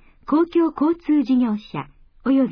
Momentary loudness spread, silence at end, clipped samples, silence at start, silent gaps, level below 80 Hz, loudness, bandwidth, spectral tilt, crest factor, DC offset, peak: 14 LU; 0 s; under 0.1%; 0.3 s; none; -52 dBFS; -20 LUFS; 5.4 kHz; -9 dB/octave; 12 dB; under 0.1%; -8 dBFS